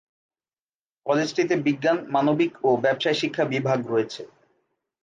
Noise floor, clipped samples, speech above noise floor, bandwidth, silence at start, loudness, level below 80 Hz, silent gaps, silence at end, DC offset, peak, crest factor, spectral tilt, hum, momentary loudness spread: under -90 dBFS; under 0.1%; over 67 dB; 9.2 kHz; 1.05 s; -23 LUFS; -74 dBFS; none; 0.8 s; under 0.1%; -8 dBFS; 16 dB; -5.5 dB/octave; none; 5 LU